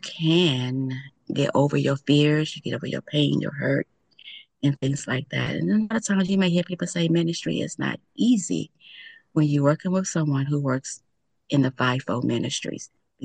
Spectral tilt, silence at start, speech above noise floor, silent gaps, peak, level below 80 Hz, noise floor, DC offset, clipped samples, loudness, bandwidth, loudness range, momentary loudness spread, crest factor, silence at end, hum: -5.5 dB/octave; 0.05 s; 23 dB; none; -6 dBFS; -64 dBFS; -47 dBFS; under 0.1%; under 0.1%; -24 LUFS; 9.8 kHz; 2 LU; 14 LU; 18 dB; 0 s; none